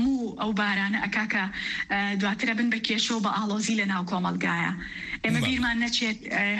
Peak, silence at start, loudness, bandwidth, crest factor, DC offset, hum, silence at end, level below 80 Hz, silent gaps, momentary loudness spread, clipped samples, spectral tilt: -12 dBFS; 0 s; -26 LUFS; 12.5 kHz; 14 dB; under 0.1%; none; 0 s; -52 dBFS; none; 4 LU; under 0.1%; -4 dB/octave